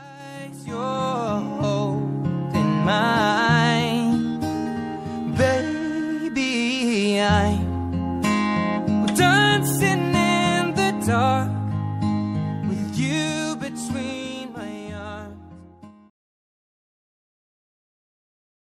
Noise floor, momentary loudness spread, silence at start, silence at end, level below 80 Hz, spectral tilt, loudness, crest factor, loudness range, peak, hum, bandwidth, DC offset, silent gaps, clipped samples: -46 dBFS; 13 LU; 0 s; 2.7 s; -52 dBFS; -5 dB/octave; -22 LUFS; 16 dB; 12 LU; -6 dBFS; none; 15.5 kHz; under 0.1%; none; under 0.1%